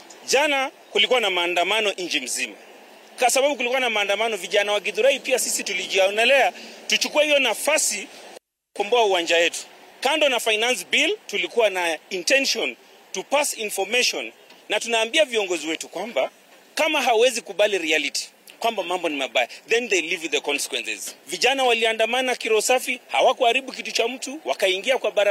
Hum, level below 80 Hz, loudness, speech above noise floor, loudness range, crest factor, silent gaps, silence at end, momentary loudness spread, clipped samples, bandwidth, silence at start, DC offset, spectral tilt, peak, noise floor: none; -88 dBFS; -21 LUFS; 25 dB; 3 LU; 16 dB; none; 0 s; 9 LU; under 0.1%; 16 kHz; 0 s; under 0.1%; 0 dB/octave; -6 dBFS; -47 dBFS